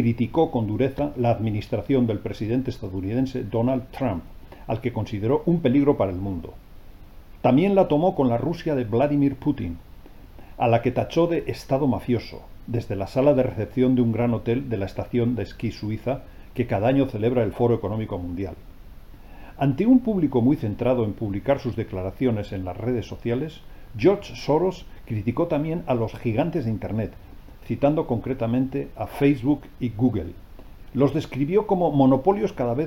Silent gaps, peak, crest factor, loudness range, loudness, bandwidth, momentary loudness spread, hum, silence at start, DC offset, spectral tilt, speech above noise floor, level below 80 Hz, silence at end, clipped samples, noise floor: none; -4 dBFS; 18 dB; 3 LU; -24 LUFS; 16 kHz; 11 LU; none; 0 s; 0.1%; -9 dB/octave; 20 dB; -44 dBFS; 0 s; under 0.1%; -43 dBFS